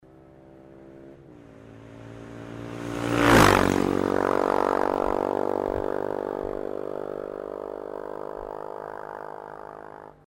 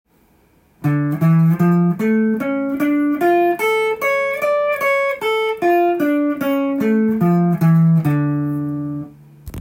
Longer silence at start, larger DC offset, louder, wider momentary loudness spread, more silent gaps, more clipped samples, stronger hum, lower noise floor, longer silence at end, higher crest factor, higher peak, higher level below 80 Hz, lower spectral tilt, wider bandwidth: second, 0.35 s vs 0.8 s; neither; second, -25 LUFS vs -17 LUFS; first, 23 LU vs 7 LU; neither; neither; neither; second, -51 dBFS vs -55 dBFS; first, 0.15 s vs 0 s; first, 20 dB vs 12 dB; about the same, -6 dBFS vs -6 dBFS; first, -46 dBFS vs -52 dBFS; second, -5 dB/octave vs -8 dB/octave; about the same, 16 kHz vs 16.5 kHz